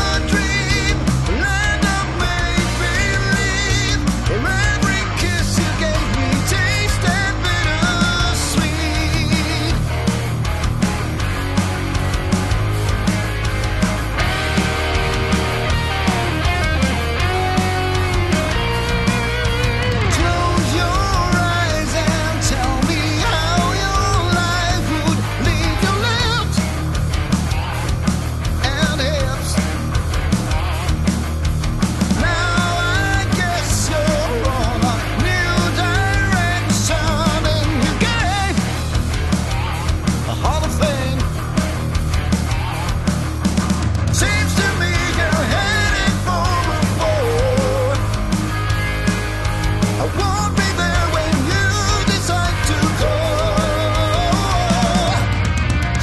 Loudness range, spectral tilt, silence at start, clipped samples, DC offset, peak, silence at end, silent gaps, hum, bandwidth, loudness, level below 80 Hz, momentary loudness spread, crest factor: 2 LU; -4.5 dB/octave; 0 s; under 0.1%; under 0.1%; -4 dBFS; 0 s; none; none; 12.5 kHz; -18 LUFS; -24 dBFS; 4 LU; 12 dB